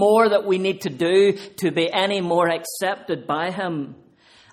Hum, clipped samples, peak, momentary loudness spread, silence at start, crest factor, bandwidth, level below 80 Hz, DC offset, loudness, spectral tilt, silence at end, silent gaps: none; under 0.1%; -4 dBFS; 10 LU; 0 s; 16 dB; 14.5 kHz; -66 dBFS; under 0.1%; -21 LUFS; -5 dB/octave; 0.6 s; none